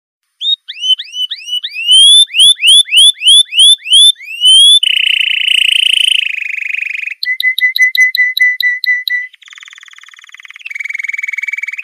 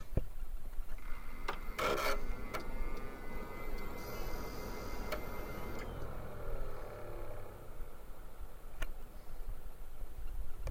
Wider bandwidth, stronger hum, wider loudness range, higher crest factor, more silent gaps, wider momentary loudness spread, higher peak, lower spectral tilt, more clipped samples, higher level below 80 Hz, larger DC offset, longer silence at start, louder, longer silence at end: about the same, 15.5 kHz vs 16.5 kHz; neither; about the same, 9 LU vs 9 LU; second, 10 dB vs 20 dB; neither; about the same, 15 LU vs 15 LU; first, 0 dBFS vs -18 dBFS; second, 6.5 dB/octave vs -5 dB/octave; neither; second, -62 dBFS vs -42 dBFS; neither; first, 0.4 s vs 0 s; first, -7 LUFS vs -45 LUFS; about the same, 0 s vs 0 s